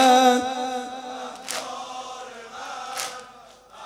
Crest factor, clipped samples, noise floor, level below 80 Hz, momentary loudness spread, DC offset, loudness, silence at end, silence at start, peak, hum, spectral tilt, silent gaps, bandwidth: 20 dB; under 0.1%; -48 dBFS; -68 dBFS; 19 LU; under 0.1%; -25 LUFS; 0 s; 0 s; -6 dBFS; none; -1 dB/octave; none; 16 kHz